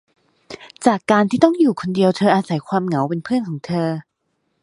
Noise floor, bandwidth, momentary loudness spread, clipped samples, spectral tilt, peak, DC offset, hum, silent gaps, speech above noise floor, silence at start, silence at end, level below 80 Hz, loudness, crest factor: -71 dBFS; 11.5 kHz; 12 LU; under 0.1%; -6.5 dB/octave; 0 dBFS; under 0.1%; none; none; 53 dB; 0.5 s; 0.6 s; -60 dBFS; -18 LUFS; 18 dB